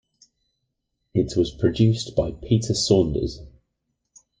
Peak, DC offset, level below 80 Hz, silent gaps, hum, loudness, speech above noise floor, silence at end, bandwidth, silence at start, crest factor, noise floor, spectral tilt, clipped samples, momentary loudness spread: -4 dBFS; under 0.1%; -42 dBFS; none; none; -22 LUFS; 56 dB; 0.9 s; 9.8 kHz; 1.15 s; 20 dB; -77 dBFS; -6 dB/octave; under 0.1%; 9 LU